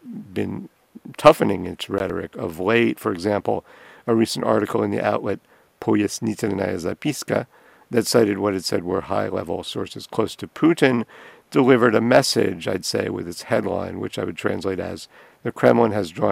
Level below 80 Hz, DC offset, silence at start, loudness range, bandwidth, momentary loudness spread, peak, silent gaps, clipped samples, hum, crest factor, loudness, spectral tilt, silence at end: -58 dBFS; under 0.1%; 0.05 s; 4 LU; 16 kHz; 13 LU; 0 dBFS; none; under 0.1%; none; 20 dB; -21 LUFS; -5 dB/octave; 0 s